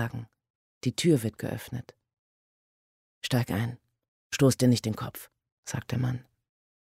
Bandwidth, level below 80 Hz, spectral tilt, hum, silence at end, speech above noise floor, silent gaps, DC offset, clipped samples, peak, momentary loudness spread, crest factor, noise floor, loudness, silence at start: 16 kHz; -60 dBFS; -5.5 dB/octave; none; 0.65 s; over 62 dB; 0.50-0.81 s, 2.19-3.21 s, 4.08-4.30 s, 5.52-5.63 s; under 0.1%; under 0.1%; -10 dBFS; 16 LU; 20 dB; under -90 dBFS; -29 LUFS; 0 s